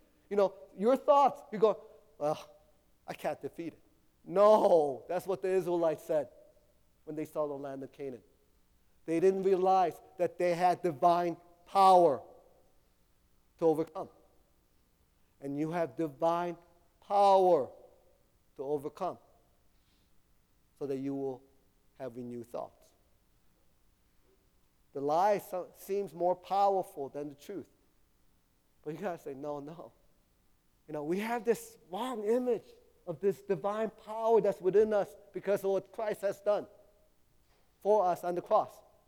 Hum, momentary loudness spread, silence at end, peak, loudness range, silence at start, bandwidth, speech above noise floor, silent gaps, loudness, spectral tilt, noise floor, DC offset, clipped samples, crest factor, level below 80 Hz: none; 18 LU; 0.4 s; -12 dBFS; 13 LU; 0.3 s; 19 kHz; 39 dB; none; -31 LUFS; -6.5 dB/octave; -70 dBFS; under 0.1%; under 0.1%; 20 dB; -72 dBFS